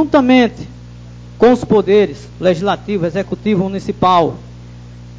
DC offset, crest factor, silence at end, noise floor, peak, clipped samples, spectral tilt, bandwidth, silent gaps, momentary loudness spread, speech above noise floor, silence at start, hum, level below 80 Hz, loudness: under 0.1%; 12 dB; 0 s; -34 dBFS; -2 dBFS; under 0.1%; -7 dB/octave; 8 kHz; none; 9 LU; 20 dB; 0 s; 60 Hz at -35 dBFS; -40 dBFS; -14 LUFS